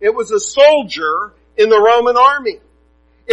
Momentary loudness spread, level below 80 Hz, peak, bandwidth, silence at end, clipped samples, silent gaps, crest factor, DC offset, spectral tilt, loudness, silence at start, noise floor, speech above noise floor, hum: 11 LU; -52 dBFS; 0 dBFS; 8.8 kHz; 0 s; under 0.1%; none; 14 dB; under 0.1%; -2 dB/octave; -12 LUFS; 0 s; -53 dBFS; 41 dB; none